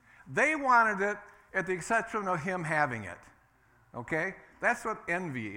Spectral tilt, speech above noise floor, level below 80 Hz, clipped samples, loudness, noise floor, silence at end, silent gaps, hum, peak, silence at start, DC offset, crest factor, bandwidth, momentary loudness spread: -5 dB/octave; 34 dB; -66 dBFS; under 0.1%; -30 LUFS; -65 dBFS; 0 s; none; none; -12 dBFS; 0.25 s; under 0.1%; 20 dB; 17 kHz; 16 LU